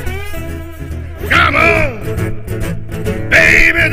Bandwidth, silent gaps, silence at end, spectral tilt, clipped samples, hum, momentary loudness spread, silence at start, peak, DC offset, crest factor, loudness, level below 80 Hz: 16 kHz; none; 0 s; -5 dB/octave; 0.3%; none; 19 LU; 0 s; 0 dBFS; 0.3%; 14 dB; -11 LUFS; -24 dBFS